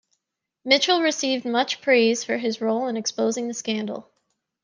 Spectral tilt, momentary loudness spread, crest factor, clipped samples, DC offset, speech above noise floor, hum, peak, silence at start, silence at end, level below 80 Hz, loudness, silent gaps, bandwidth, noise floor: -2.5 dB/octave; 9 LU; 20 dB; under 0.1%; under 0.1%; 59 dB; none; -4 dBFS; 0.65 s; 0.65 s; -78 dBFS; -22 LUFS; none; 10 kHz; -81 dBFS